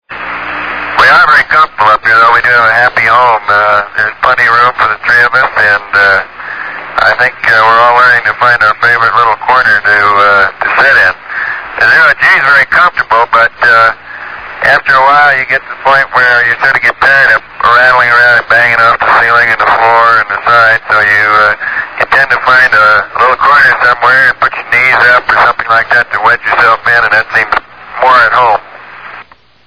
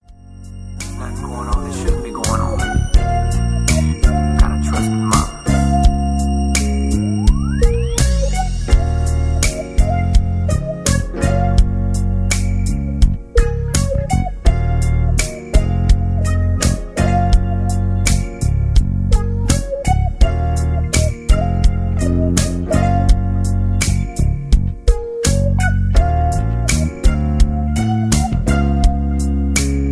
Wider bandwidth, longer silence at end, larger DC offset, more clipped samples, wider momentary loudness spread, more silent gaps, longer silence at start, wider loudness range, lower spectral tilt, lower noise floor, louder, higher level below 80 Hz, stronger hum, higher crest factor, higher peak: second, 5.4 kHz vs 11 kHz; first, 0.45 s vs 0 s; first, 0.6% vs under 0.1%; first, 4% vs under 0.1%; first, 8 LU vs 4 LU; neither; about the same, 0.1 s vs 0.1 s; about the same, 2 LU vs 1 LU; second, -3.5 dB/octave vs -5.5 dB/octave; about the same, -34 dBFS vs -36 dBFS; first, -6 LUFS vs -17 LUFS; second, -42 dBFS vs -18 dBFS; neither; second, 8 dB vs 14 dB; about the same, 0 dBFS vs 0 dBFS